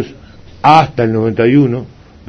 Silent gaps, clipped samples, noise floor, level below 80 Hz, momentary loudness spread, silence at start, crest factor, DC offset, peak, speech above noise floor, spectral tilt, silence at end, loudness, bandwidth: none; 0.5%; -36 dBFS; -42 dBFS; 11 LU; 0 s; 12 dB; under 0.1%; 0 dBFS; 26 dB; -7.5 dB/octave; 0.4 s; -11 LUFS; 8.2 kHz